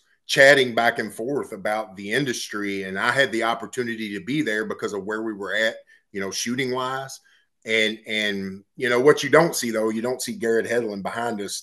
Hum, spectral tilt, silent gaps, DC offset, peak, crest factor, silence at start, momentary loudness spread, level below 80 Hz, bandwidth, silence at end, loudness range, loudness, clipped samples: none; -3.5 dB/octave; none; under 0.1%; 0 dBFS; 24 dB; 0.3 s; 12 LU; -72 dBFS; 12.5 kHz; 0 s; 5 LU; -22 LUFS; under 0.1%